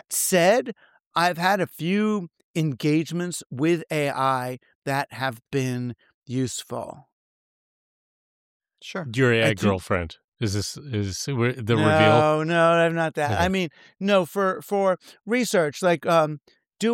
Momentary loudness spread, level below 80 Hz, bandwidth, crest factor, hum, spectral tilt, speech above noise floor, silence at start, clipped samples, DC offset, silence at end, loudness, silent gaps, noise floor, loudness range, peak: 13 LU; -56 dBFS; 17 kHz; 18 dB; none; -5 dB/octave; over 67 dB; 0.1 s; under 0.1%; under 0.1%; 0 s; -23 LUFS; 1.06-1.11 s, 2.44-2.54 s, 4.75-4.82 s, 6.14-6.22 s, 7.12-8.60 s, 10.24-10.32 s; under -90 dBFS; 9 LU; -6 dBFS